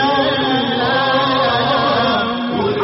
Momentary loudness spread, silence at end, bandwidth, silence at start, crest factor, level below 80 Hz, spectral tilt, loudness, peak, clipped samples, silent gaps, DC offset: 4 LU; 0 s; 6 kHz; 0 s; 10 dB; -48 dBFS; -2 dB/octave; -15 LUFS; -4 dBFS; under 0.1%; none; under 0.1%